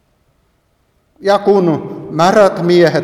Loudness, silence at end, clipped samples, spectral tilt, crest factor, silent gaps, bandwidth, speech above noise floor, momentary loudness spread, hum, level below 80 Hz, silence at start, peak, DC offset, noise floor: -12 LUFS; 0 s; under 0.1%; -6.5 dB/octave; 14 dB; none; 13.5 kHz; 48 dB; 11 LU; none; -54 dBFS; 1.2 s; 0 dBFS; under 0.1%; -59 dBFS